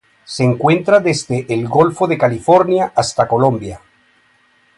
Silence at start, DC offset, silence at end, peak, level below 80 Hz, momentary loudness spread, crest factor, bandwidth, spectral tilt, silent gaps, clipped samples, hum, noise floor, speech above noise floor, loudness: 0.3 s; under 0.1%; 1 s; 0 dBFS; -50 dBFS; 7 LU; 16 dB; 11.5 kHz; -6 dB/octave; none; under 0.1%; none; -55 dBFS; 41 dB; -14 LUFS